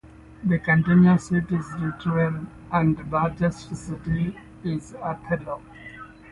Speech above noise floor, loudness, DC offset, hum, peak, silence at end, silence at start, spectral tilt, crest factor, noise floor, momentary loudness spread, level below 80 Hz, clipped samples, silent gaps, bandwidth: 19 dB; -24 LUFS; under 0.1%; none; -6 dBFS; 0 s; 0.05 s; -8 dB/octave; 18 dB; -42 dBFS; 17 LU; -48 dBFS; under 0.1%; none; 10.5 kHz